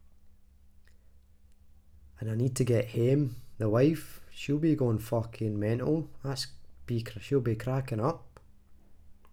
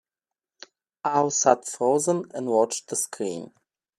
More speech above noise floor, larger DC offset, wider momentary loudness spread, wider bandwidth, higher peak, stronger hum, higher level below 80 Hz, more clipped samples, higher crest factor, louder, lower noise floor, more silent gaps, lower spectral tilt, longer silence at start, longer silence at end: second, 28 dB vs over 66 dB; neither; about the same, 10 LU vs 11 LU; first, 16 kHz vs 14.5 kHz; second, -14 dBFS vs -4 dBFS; neither; first, -56 dBFS vs -76 dBFS; neither; about the same, 18 dB vs 22 dB; second, -31 LUFS vs -24 LUFS; second, -57 dBFS vs under -90 dBFS; neither; first, -7 dB/octave vs -3.5 dB/octave; second, 0.25 s vs 1.05 s; second, 0.05 s vs 0.5 s